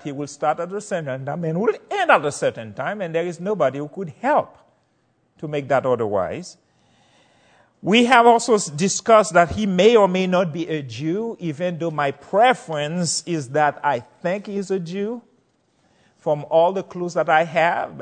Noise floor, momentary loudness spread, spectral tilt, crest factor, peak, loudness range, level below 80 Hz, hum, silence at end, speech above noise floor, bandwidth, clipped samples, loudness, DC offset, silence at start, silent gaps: -65 dBFS; 13 LU; -4.5 dB/octave; 20 dB; 0 dBFS; 8 LU; -56 dBFS; none; 0 s; 45 dB; 9.4 kHz; under 0.1%; -20 LUFS; under 0.1%; 0.05 s; none